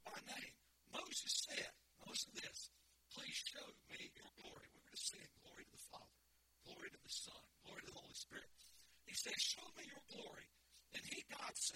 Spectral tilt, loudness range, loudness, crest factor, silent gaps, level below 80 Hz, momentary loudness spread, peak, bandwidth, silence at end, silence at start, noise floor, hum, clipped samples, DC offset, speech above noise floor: 0 dB/octave; 8 LU; -49 LUFS; 24 dB; none; -80 dBFS; 20 LU; -30 dBFS; 16.5 kHz; 0 s; 0 s; -77 dBFS; none; under 0.1%; under 0.1%; 28 dB